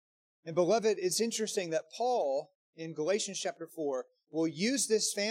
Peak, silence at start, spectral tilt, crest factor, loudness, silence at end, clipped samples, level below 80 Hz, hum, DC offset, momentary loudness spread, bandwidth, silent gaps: -16 dBFS; 0.45 s; -3 dB/octave; 18 dB; -32 LUFS; 0 s; under 0.1%; -86 dBFS; none; under 0.1%; 10 LU; 16.5 kHz; 2.55-2.73 s